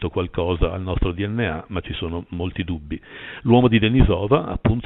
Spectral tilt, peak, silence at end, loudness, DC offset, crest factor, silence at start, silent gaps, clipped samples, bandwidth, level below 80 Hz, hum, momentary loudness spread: -11.5 dB/octave; -2 dBFS; 0 s; -21 LUFS; under 0.1%; 18 dB; 0 s; none; under 0.1%; 4.1 kHz; -30 dBFS; none; 12 LU